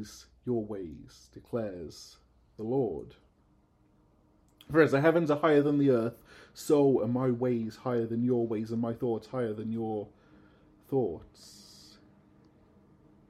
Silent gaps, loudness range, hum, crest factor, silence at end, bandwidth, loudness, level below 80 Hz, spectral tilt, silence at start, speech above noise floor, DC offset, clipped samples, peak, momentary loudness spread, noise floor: none; 12 LU; none; 22 dB; 1.8 s; 14.5 kHz; -29 LUFS; -64 dBFS; -7.5 dB/octave; 0 s; 37 dB; under 0.1%; under 0.1%; -10 dBFS; 21 LU; -66 dBFS